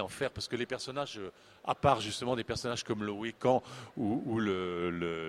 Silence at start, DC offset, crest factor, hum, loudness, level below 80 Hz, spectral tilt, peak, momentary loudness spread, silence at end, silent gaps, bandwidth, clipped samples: 0 s; under 0.1%; 24 dB; none; -34 LUFS; -60 dBFS; -5 dB/octave; -10 dBFS; 9 LU; 0 s; none; 14.5 kHz; under 0.1%